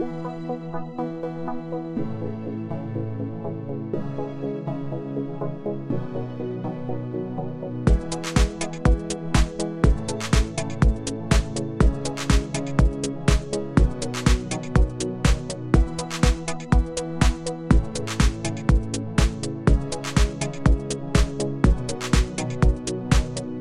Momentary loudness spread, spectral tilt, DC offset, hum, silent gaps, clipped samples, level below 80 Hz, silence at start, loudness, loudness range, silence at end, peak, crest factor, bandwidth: 8 LU; -5.5 dB/octave; under 0.1%; none; none; under 0.1%; -26 dBFS; 0 s; -25 LUFS; 7 LU; 0 s; -4 dBFS; 18 dB; 12 kHz